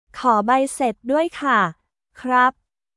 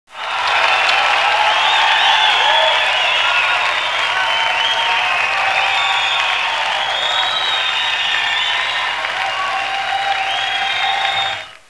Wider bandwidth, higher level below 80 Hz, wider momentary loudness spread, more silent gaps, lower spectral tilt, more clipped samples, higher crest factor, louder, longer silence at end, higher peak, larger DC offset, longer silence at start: about the same, 12 kHz vs 11 kHz; about the same, -60 dBFS vs -62 dBFS; about the same, 6 LU vs 7 LU; neither; first, -4.5 dB/octave vs 0.5 dB/octave; neither; about the same, 16 dB vs 16 dB; second, -19 LUFS vs -14 LUFS; first, 0.45 s vs 0.1 s; second, -4 dBFS vs 0 dBFS; second, under 0.1% vs 0.2%; about the same, 0.15 s vs 0.1 s